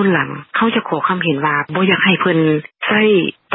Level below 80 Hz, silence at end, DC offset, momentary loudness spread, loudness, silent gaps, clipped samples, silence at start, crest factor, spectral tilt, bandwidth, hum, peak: -60 dBFS; 0 s; under 0.1%; 5 LU; -15 LUFS; none; under 0.1%; 0 s; 16 dB; -11 dB/octave; 4 kHz; none; 0 dBFS